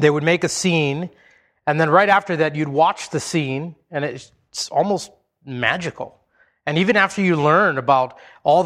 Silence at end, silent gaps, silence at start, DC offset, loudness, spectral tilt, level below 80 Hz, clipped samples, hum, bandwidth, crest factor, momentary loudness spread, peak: 0 s; none; 0 s; under 0.1%; -19 LUFS; -5 dB/octave; -60 dBFS; under 0.1%; none; 14 kHz; 20 dB; 14 LU; 0 dBFS